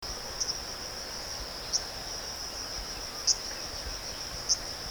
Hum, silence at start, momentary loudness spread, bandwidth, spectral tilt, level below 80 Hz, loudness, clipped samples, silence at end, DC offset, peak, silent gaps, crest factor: none; 0 s; 9 LU; over 20 kHz; -0.5 dB/octave; -48 dBFS; -32 LUFS; under 0.1%; 0 s; under 0.1%; -12 dBFS; none; 22 dB